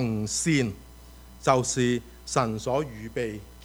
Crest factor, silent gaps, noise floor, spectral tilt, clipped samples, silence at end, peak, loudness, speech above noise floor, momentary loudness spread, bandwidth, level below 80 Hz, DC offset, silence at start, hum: 22 dB; none; -47 dBFS; -4.5 dB/octave; under 0.1%; 0 s; -6 dBFS; -27 LUFS; 21 dB; 9 LU; over 20 kHz; -48 dBFS; under 0.1%; 0 s; none